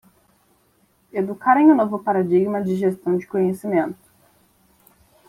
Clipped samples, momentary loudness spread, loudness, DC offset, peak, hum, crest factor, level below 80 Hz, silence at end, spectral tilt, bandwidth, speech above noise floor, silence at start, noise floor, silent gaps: under 0.1%; 12 LU; -20 LUFS; under 0.1%; -4 dBFS; none; 18 dB; -66 dBFS; 1.35 s; -8.5 dB/octave; 14 kHz; 43 dB; 1.15 s; -61 dBFS; none